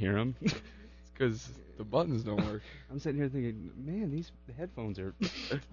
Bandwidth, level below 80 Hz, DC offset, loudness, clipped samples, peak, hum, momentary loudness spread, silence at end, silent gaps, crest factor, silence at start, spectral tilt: 7 kHz; -54 dBFS; under 0.1%; -36 LUFS; under 0.1%; -16 dBFS; none; 14 LU; 0 s; none; 18 dB; 0 s; -6 dB/octave